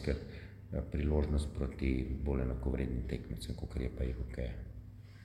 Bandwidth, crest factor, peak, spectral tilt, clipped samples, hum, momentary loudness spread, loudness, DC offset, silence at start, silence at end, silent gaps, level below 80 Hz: 12 kHz; 20 dB; -18 dBFS; -8 dB/octave; under 0.1%; none; 14 LU; -38 LUFS; under 0.1%; 0 s; 0 s; none; -40 dBFS